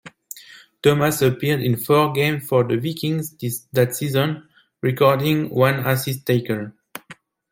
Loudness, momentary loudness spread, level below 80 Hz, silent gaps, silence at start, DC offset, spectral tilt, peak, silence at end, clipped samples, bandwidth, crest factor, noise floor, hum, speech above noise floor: -20 LUFS; 18 LU; -58 dBFS; none; 0.05 s; under 0.1%; -5.5 dB/octave; -2 dBFS; 0.4 s; under 0.1%; 17 kHz; 18 dB; -47 dBFS; none; 27 dB